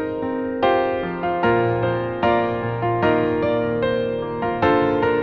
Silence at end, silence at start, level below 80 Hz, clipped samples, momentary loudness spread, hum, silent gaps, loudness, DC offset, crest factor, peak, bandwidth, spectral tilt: 0 s; 0 s; -46 dBFS; under 0.1%; 6 LU; none; none; -21 LUFS; under 0.1%; 16 dB; -4 dBFS; 6.2 kHz; -9 dB/octave